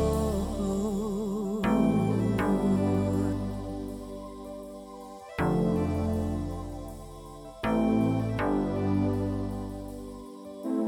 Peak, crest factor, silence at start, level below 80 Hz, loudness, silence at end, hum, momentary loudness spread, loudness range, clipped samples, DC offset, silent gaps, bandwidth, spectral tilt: -14 dBFS; 16 dB; 0 s; -42 dBFS; -29 LUFS; 0 s; none; 17 LU; 5 LU; under 0.1%; under 0.1%; none; 17 kHz; -7.5 dB/octave